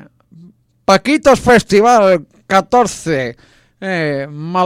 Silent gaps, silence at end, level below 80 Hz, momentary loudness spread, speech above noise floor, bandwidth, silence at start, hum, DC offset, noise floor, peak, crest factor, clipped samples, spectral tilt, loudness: none; 0 s; -42 dBFS; 12 LU; 32 dB; 16 kHz; 0.9 s; none; under 0.1%; -44 dBFS; 0 dBFS; 14 dB; under 0.1%; -5 dB/octave; -13 LUFS